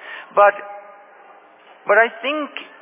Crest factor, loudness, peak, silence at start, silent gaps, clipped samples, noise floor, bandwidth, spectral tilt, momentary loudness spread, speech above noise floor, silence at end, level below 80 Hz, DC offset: 18 dB; -17 LUFS; -2 dBFS; 0.05 s; none; under 0.1%; -47 dBFS; 3.8 kHz; -6 dB/octave; 19 LU; 30 dB; 0.15 s; -76 dBFS; under 0.1%